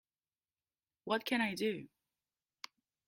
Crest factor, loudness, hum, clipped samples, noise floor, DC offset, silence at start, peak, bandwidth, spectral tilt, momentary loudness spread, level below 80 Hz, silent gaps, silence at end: 22 dB; -36 LUFS; none; under 0.1%; under -90 dBFS; under 0.1%; 1.05 s; -20 dBFS; 16 kHz; -4.5 dB/octave; 19 LU; -82 dBFS; none; 1.2 s